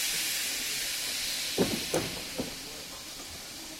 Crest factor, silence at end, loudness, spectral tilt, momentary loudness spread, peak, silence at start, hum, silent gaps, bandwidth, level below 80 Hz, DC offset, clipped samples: 20 dB; 0 s; -31 LUFS; -1.5 dB/octave; 11 LU; -14 dBFS; 0 s; none; none; 16.5 kHz; -56 dBFS; under 0.1%; under 0.1%